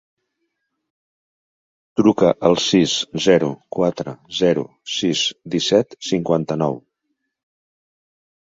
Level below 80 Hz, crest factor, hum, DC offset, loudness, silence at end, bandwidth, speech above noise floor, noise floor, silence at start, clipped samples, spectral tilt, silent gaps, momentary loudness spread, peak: -56 dBFS; 20 dB; none; under 0.1%; -19 LUFS; 1.65 s; 7.8 kHz; 57 dB; -75 dBFS; 1.95 s; under 0.1%; -4.5 dB/octave; none; 9 LU; -2 dBFS